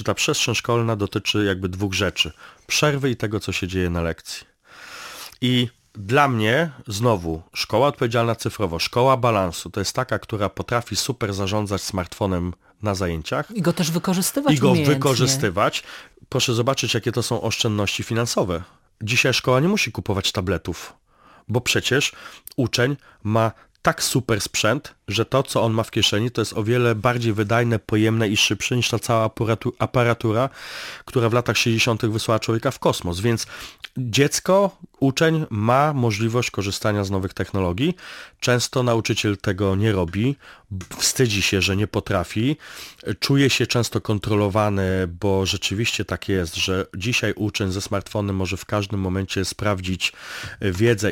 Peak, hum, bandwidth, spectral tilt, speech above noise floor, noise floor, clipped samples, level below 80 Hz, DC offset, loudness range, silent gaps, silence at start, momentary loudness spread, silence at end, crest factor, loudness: -2 dBFS; none; 17 kHz; -4.5 dB/octave; 21 dB; -43 dBFS; under 0.1%; -48 dBFS; under 0.1%; 4 LU; none; 0 s; 9 LU; 0 s; 20 dB; -21 LUFS